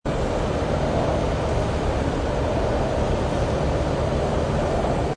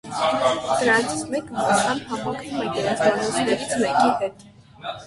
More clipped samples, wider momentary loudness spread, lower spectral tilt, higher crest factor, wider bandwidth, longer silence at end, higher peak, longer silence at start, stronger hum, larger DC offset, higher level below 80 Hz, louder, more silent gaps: neither; second, 1 LU vs 9 LU; first, -6.5 dB/octave vs -3.5 dB/octave; second, 12 dB vs 18 dB; about the same, 10.5 kHz vs 11.5 kHz; about the same, 0 s vs 0 s; second, -10 dBFS vs -6 dBFS; about the same, 0.05 s vs 0.05 s; neither; neither; first, -28 dBFS vs -56 dBFS; about the same, -23 LUFS vs -22 LUFS; neither